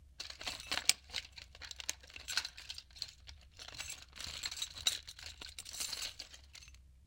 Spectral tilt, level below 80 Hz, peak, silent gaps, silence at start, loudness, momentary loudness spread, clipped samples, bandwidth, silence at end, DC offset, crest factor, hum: 1 dB/octave; -62 dBFS; -4 dBFS; none; 0 s; -40 LUFS; 19 LU; under 0.1%; 17 kHz; 0 s; under 0.1%; 40 dB; none